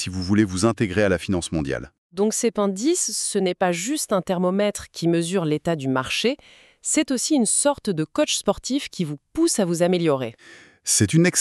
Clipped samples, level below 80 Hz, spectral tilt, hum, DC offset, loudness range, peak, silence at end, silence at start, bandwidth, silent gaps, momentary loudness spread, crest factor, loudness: under 0.1%; -50 dBFS; -4 dB/octave; none; under 0.1%; 1 LU; -4 dBFS; 0 s; 0 s; 13.5 kHz; 1.98-2.10 s; 7 LU; 18 dB; -22 LUFS